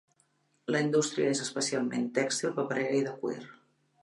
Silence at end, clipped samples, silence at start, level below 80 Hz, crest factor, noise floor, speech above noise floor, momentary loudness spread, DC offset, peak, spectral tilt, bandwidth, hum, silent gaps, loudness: 0.5 s; under 0.1%; 0.7 s; -82 dBFS; 18 dB; -72 dBFS; 42 dB; 9 LU; under 0.1%; -14 dBFS; -4 dB/octave; 11.5 kHz; none; none; -30 LUFS